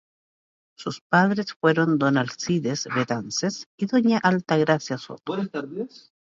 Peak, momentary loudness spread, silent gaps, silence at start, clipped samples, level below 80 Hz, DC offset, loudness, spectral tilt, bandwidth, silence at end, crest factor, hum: -6 dBFS; 13 LU; 1.01-1.10 s, 1.56-1.60 s, 3.66-3.78 s; 0.8 s; under 0.1%; -68 dBFS; under 0.1%; -23 LUFS; -5.5 dB/octave; 7.8 kHz; 0.45 s; 18 dB; none